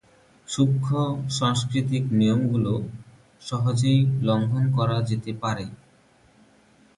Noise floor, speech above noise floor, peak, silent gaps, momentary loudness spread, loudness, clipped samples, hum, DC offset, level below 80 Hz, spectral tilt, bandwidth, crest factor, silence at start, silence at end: -58 dBFS; 35 dB; -8 dBFS; none; 12 LU; -24 LUFS; under 0.1%; none; under 0.1%; -54 dBFS; -6.5 dB/octave; 11.5 kHz; 16 dB; 0.5 s; 1.2 s